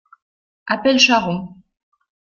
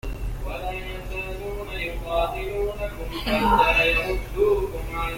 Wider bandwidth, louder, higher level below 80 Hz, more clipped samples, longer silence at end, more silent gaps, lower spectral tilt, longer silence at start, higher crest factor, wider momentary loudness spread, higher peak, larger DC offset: second, 7.4 kHz vs 17 kHz; first, -16 LUFS vs -24 LUFS; second, -58 dBFS vs -32 dBFS; neither; first, 0.85 s vs 0 s; neither; second, -3.5 dB/octave vs -5 dB/octave; first, 0.65 s vs 0.05 s; about the same, 18 dB vs 18 dB; first, 23 LU vs 14 LU; first, -2 dBFS vs -6 dBFS; neither